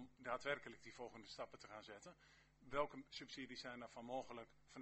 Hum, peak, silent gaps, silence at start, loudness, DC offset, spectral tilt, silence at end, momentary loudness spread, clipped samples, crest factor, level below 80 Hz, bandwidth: none; -28 dBFS; none; 0 s; -51 LUFS; under 0.1%; -4 dB/octave; 0 s; 14 LU; under 0.1%; 24 dB; -74 dBFS; 8.2 kHz